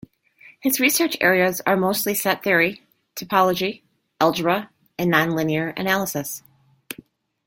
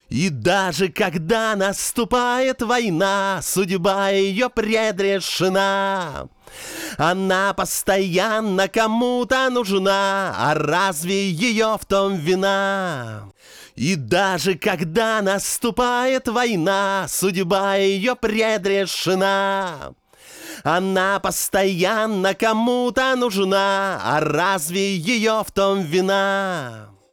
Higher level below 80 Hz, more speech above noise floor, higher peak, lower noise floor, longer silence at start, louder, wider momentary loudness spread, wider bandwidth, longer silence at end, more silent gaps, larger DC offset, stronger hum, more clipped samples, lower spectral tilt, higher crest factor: second, -62 dBFS vs -50 dBFS; first, 31 dB vs 21 dB; first, -2 dBFS vs -6 dBFS; first, -51 dBFS vs -41 dBFS; first, 0.45 s vs 0.1 s; about the same, -20 LUFS vs -20 LUFS; first, 19 LU vs 5 LU; second, 17 kHz vs 19.5 kHz; first, 0.55 s vs 0.25 s; neither; neither; neither; neither; about the same, -4 dB/octave vs -4 dB/octave; first, 20 dB vs 14 dB